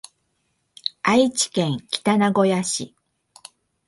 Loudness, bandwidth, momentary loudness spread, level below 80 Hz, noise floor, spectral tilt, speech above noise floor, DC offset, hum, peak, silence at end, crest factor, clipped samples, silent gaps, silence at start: -21 LUFS; 11.5 kHz; 11 LU; -64 dBFS; -71 dBFS; -4 dB/octave; 51 dB; under 0.1%; none; -4 dBFS; 1 s; 20 dB; under 0.1%; none; 0.85 s